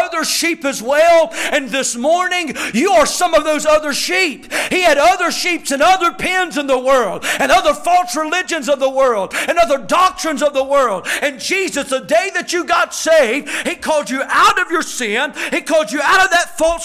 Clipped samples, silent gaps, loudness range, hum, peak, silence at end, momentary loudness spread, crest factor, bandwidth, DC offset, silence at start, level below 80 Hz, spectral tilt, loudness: under 0.1%; none; 2 LU; none; -4 dBFS; 0 s; 6 LU; 10 dB; 16 kHz; under 0.1%; 0 s; -46 dBFS; -1.5 dB/octave; -14 LUFS